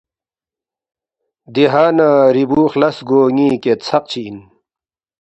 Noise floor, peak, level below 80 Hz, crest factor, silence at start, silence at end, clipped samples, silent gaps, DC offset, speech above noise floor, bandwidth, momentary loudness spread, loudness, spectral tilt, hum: under -90 dBFS; 0 dBFS; -56 dBFS; 16 dB; 1.5 s; 0.8 s; under 0.1%; none; under 0.1%; over 77 dB; 8.2 kHz; 12 LU; -13 LUFS; -7 dB/octave; none